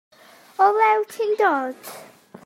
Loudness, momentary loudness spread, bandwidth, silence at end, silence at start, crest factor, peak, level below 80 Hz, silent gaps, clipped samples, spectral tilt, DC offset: -20 LUFS; 21 LU; 16 kHz; 0.4 s; 0.6 s; 16 dB; -6 dBFS; -86 dBFS; none; under 0.1%; -3 dB/octave; under 0.1%